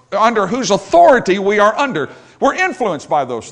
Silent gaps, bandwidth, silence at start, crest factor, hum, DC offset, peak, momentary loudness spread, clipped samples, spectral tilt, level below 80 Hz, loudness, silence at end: none; 10 kHz; 0.1 s; 14 dB; none; under 0.1%; 0 dBFS; 9 LU; 0.2%; -4 dB/octave; -50 dBFS; -14 LUFS; 0 s